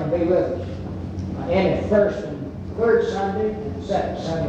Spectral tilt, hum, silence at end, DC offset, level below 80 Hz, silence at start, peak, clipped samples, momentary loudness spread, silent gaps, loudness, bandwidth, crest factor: -7.5 dB/octave; none; 0 s; under 0.1%; -42 dBFS; 0 s; -6 dBFS; under 0.1%; 12 LU; none; -23 LUFS; 8.4 kHz; 16 dB